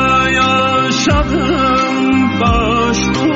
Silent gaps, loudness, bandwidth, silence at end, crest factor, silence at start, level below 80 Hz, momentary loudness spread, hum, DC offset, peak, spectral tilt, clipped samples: none; -12 LUFS; 8 kHz; 0 s; 10 dB; 0 s; -26 dBFS; 3 LU; none; under 0.1%; -2 dBFS; -3.5 dB/octave; under 0.1%